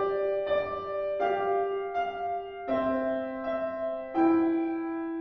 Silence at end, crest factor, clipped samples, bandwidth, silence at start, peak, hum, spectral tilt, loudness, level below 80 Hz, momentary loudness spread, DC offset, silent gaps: 0 s; 14 dB; under 0.1%; 5.8 kHz; 0 s; -14 dBFS; none; -8 dB/octave; -29 LUFS; -60 dBFS; 7 LU; under 0.1%; none